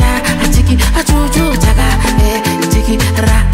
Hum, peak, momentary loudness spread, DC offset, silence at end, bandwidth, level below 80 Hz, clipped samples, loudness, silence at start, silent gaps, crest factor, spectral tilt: none; 0 dBFS; 2 LU; under 0.1%; 0 s; 16.5 kHz; -12 dBFS; under 0.1%; -12 LUFS; 0 s; none; 10 dB; -5 dB/octave